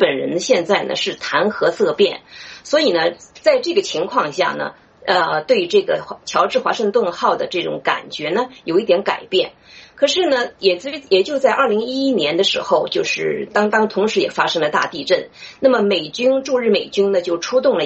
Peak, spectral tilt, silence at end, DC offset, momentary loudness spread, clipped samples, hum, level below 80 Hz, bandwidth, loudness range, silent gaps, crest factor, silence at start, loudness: -2 dBFS; -3.5 dB/octave; 0 s; under 0.1%; 5 LU; under 0.1%; none; -62 dBFS; 8.2 kHz; 2 LU; none; 16 dB; 0 s; -18 LUFS